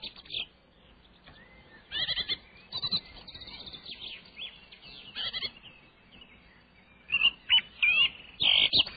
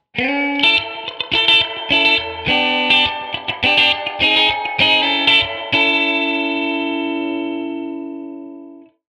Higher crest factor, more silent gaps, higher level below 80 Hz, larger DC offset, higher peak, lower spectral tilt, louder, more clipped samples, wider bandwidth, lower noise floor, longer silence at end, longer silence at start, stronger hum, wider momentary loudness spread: about the same, 20 dB vs 18 dB; neither; second, -60 dBFS vs -50 dBFS; neither; second, -12 dBFS vs 0 dBFS; first, -5 dB/octave vs -3.5 dB/octave; second, -27 LUFS vs -15 LUFS; neither; second, 5 kHz vs 11.5 kHz; first, -59 dBFS vs -40 dBFS; second, 0 s vs 0.35 s; second, 0 s vs 0.15 s; neither; first, 20 LU vs 13 LU